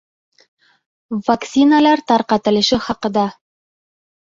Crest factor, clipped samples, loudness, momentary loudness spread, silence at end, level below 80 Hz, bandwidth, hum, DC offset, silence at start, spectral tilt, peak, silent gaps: 16 dB; under 0.1%; -16 LUFS; 10 LU; 1 s; -52 dBFS; 7.6 kHz; none; under 0.1%; 1.1 s; -4.5 dB/octave; -2 dBFS; none